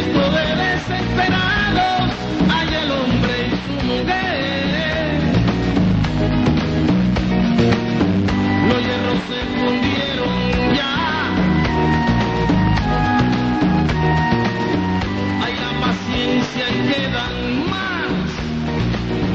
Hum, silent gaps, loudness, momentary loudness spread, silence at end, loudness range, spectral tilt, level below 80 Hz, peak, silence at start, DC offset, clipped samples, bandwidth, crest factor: none; none; -18 LUFS; 4 LU; 0 s; 3 LU; -6.5 dB/octave; -30 dBFS; -4 dBFS; 0 s; under 0.1%; under 0.1%; 7.8 kHz; 14 dB